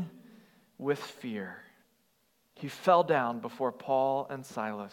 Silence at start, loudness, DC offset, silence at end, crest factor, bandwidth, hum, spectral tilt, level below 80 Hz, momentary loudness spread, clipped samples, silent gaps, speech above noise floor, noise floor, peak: 0 s; -31 LUFS; under 0.1%; 0.05 s; 22 dB; 17 kHz; none; -6 dB/octave; -86 dBFS; 17 LU; under 0.1%; none; 42 dB; -72 dBFS; -10 dBFS